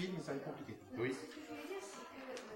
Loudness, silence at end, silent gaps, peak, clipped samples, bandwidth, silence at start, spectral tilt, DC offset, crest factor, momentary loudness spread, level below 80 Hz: -46 LUFS; 0 s; none; -28 dBFS; under 0.1%; 16 kHz; 0 s; -5 dB/octave; under 0.1%; 16 dB; 9 LU; -80 dBFS